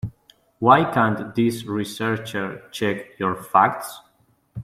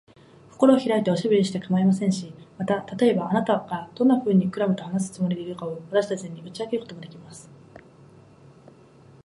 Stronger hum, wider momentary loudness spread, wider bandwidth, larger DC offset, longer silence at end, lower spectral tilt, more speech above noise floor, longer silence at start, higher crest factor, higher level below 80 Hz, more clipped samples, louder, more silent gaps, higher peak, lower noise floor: neither; about the same, 15 LU vs 17 LU; first, 15.5 kHz vs 11.5 kHz; neither; second, 0 s vs 1.45 s; about the same, -6 dB/octave vs -7 dB/octave; first, 35 dB vs 28 dB; second, 0.05 s vs 0.6 s; about the same, 20 dB vs 22 dB; first, -58 dBFS vs -68 dBFS; neither; first, -21 LUFS vs -24 LUFS; neither; about the same, -2 dBFS vs -4 dBFS; first, -57 dBFS vs -51 dBFS